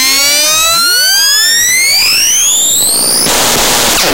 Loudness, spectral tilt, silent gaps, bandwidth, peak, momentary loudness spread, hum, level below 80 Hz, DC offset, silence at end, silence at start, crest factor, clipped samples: -6 LUFS; 1 dB/octave; none; 16.5 kHz; 0 dBFS; 2 LU; none; -36 dBFS; under 0.1%; 0 s; 0 s; 8 dB; under 0.1%